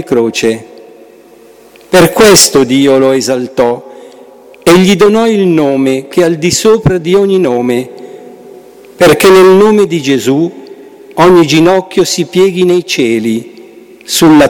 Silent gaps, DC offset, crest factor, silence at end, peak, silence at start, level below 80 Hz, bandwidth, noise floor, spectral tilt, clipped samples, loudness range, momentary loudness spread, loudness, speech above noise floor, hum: none; under 0.1%; 8 dB; 0 s; 0 dBFS; 0 s; -40 dBFS; over 20 kHz; -38 dBFS; -4.5 dB/octave; under 0.1%; 2 LU; 10 LU; -8 LUFS; 31 dB; none